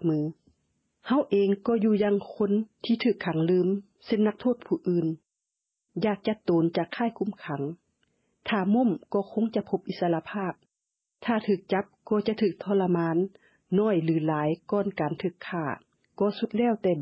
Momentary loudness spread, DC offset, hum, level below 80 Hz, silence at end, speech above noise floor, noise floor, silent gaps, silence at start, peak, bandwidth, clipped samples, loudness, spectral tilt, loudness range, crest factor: 9 LU; under 0.1%; none; -68 dBFS; 0 s; 58 dB; -84 dBFS; none; 0 s; -14 dBFS; 5.8 kHz; under 0.1%; -27 LUFS; -10 dB/octave; 3 LU; 14 dB